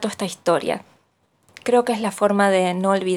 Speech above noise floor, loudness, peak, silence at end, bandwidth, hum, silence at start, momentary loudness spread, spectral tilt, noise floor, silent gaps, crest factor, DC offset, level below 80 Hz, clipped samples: 44 dB; -20 LUFS; -4 dBFS; 0 s; 15.5 kHz; none; 0 s; 10 LU; -5 dB/octave; -64 dBFS; none; 18 dB; under 0.1%; -70 dBFS; under 0.1%